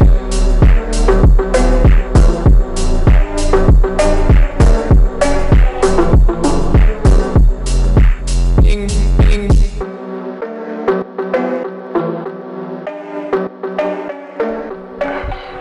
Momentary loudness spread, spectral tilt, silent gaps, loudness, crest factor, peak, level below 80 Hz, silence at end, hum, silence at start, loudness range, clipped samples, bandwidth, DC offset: 13 LU; -7 dB/octave; none; -14 LUFS; 8 dB; -2 dBFS; -12 dBFS; 0 s; none; 0 s; 8 LU; under 0.1%; 11 kHz; under 0.1%